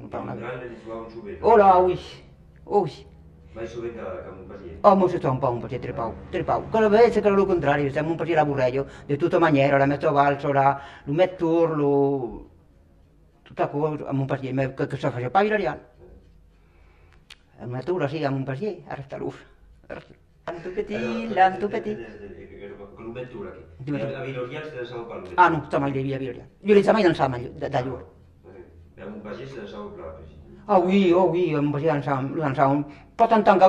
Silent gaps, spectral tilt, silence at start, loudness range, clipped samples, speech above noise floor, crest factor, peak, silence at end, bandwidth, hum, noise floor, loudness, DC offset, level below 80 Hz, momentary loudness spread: none; -8 dB/octave; 0 s; 10 LU; under 0.1%; 33 dB; 22 dB; -2 dBFS; 0 s; 9.8 kHz; none; -56 dBFS; -23 LUFS; under 0.1%; -52 dBFS; 20 LU